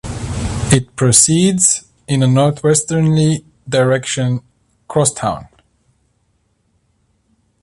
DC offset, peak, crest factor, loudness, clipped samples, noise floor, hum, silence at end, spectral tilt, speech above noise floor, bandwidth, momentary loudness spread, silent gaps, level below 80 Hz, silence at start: under 0.1%; 0 dBFS; 16 dB; -14 LUFS; under 0.1%; -62 dBFS; none; 2.15 s; -4.5 dB/octave; 48 dB; 13.5 kHz; 12 LU; none; -38 dBFS; 0.05 s